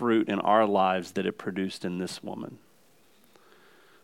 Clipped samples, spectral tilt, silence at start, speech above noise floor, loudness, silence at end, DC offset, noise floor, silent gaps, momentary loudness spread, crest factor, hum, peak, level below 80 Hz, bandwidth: under 0.1%; -6 dB/octave; 0 s; 36 dB; -27 LUFS; 1.45 s; under 0.1%; -63 dBFS; none; 15 LU; 20 dB; none; -10 dBFS; -80 dBFS; 16 kHz